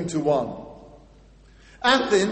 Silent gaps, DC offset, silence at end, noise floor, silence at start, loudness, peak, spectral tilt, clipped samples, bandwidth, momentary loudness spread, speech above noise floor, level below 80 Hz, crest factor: none; under 0.1%; 0 s; -51 dBFS; 0 s; -22 LUFS; -4 dBFS; -4 dB/octave; under 0.1%; 8.8 kHz; 20 LU; 30 dB; -52 dBFS; 20 dB